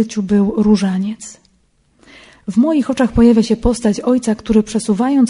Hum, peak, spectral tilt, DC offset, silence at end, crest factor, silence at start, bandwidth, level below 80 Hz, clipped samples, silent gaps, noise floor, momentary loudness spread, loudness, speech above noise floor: none; 0 dBFS; -6.5 dB/octave; under 0.1%; 0 s; 14 dB; 0 s; 11 kHz; -34 dBFS; under 0.1%; none; -57 dBFS; 10 LU; -15 LUFS; 43 dB